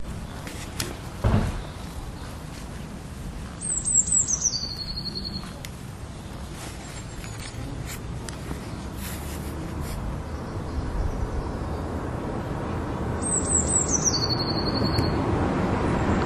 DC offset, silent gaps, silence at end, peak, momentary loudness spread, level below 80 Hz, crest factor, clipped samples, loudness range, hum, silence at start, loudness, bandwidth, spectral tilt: under 0.1%; none; 0 s; -8 dBFS; 17 LU; -36 dBFS; 20 dB; under 0.1%; 11 LU; none; 0 s; -27 LUFS; 13.5 kHz; -3.5 dB/octave